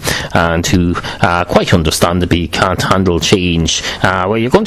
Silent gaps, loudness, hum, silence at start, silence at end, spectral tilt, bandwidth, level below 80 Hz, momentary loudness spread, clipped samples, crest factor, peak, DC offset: none; -13 LUFS; none; 0 s; 0 s; -4.5 dB/octave; 15.5 kHz; -26 dBFS; 3 LU; 0.2%; 12 dB; 0 dBFS; under 0.1%